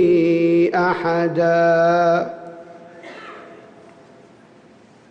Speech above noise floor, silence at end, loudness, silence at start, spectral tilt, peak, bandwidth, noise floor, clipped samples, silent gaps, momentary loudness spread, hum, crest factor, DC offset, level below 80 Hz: 32 dB; 1.55 s; -17 LUFS; 0 s; -7.5 dB/octave; -8 dBFS; 6.6 kHz; -48 dBFS; under 0.1%; none; 23 LU; none; 12 dB; under 0.1%; -60 dBFS